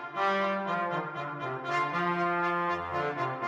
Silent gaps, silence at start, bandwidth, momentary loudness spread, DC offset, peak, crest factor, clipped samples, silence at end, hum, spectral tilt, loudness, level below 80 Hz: none; 0 s; 10 kHz; 7 LU; under 0.1%; -18 dBFS; 14 dB; under 0.1%; 0 s; none; -6 dB/octave; -30 LUFS; -68 dBFS